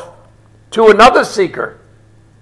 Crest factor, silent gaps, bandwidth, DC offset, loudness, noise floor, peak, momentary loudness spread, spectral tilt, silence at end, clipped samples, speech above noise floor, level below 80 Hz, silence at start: 12 dB; none; 12 kHz; under 0.1%; -9 LUFS; -45 dBFS; 0 dBFS; 17 LU; -4 dB/octave; 0.7 s; 1%; 36 dB; -42 dBFS; 0 s